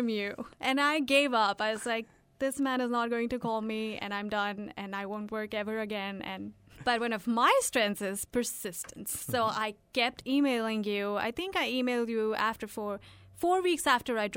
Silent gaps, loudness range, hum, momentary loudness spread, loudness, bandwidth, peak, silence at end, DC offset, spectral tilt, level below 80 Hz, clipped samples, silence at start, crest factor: none; 5 LU; none; 11 LU; -31 LUFS; 17 kHz; -12 dBFS; 0 s; under 0.1%; -3 dB/octave; -64 dBFS; under 0.1%; 0 s; 18 dB